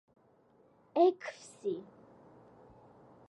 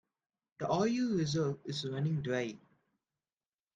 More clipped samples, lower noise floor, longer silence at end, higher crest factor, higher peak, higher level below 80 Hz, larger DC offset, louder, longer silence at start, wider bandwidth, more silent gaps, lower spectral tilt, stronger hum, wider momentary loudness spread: neither; second, -66 dBFS vs under -90 dBFS; first, 1.5 s vs 1.2 s; about the same, 22 dB vs 18 dB; about the same, -16 dBFS vs -18 dBFS; second, -80 dBFS vs -70 dBFS; neither; about the same, -33 LUFS vs -34 LUFS; first, 0.95 s vs 0.6 s; first, 11 kHz vs 9.2 kHz; neither; about the same, -5.5 dB/octave vs -6 dB/octave; neither; first, 16 LU vs 10 LU